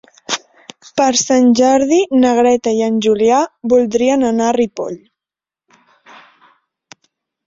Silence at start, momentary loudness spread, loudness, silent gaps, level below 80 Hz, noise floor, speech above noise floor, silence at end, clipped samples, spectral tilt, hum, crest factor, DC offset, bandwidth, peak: 0.3 s; 11 LU; -14 LUFS; none; -56 dBFS; -89 dBFS; 76 dB; 2.5 s; under 0.1%; -3.5 dB/octave; none; 14 dB; under 0.1%; 7.8 kHz; -2 dBFS